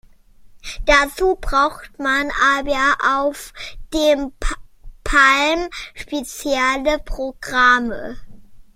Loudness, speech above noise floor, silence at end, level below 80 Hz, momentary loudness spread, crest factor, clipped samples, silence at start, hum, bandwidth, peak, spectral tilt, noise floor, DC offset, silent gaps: -18 LUFS; 27 dB; 0.15 s; -32 dBFS; 18 LU; 18 dB; under 0.1%; 0.45 s; none; 16.5 kHz; 0 dBFS; -2.5 dB/octave; -45 dBFS; under 0.1%; none